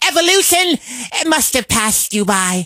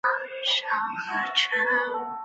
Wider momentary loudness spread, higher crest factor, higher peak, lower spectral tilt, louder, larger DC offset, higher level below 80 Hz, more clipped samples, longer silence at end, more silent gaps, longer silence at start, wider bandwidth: about the same, 8 LU vs 6 LU; about the same, 14 dB vs 18 dB; first, 0 dBFS vs -10 dBFS; about the same, -2 dB/octave vs -1 dB/octave; first, -13 LUFS vs -25 LUFS; neither; first, -44 dBFS vs -78 dBFS; neither; about the same, 0 s vs 0 s; neither; about the same, 0 s vs 0.05 s; first, 16.5 kHz vs 8.2 kHz